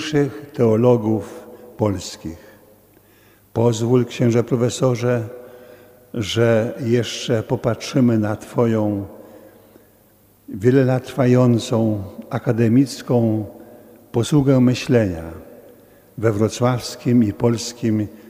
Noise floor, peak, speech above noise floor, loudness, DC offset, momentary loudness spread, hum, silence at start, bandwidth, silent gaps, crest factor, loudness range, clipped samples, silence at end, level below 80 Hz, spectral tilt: -54 dBFS; -2 dBFS; 36 dB; -19 LUFS; under 0.1%; 13 LU; none; 0 s; 16 kHz; none; 18 dB; 3 LU; under 0.1%; 0.1 s; -52 dBFS; -6.5 dB/octave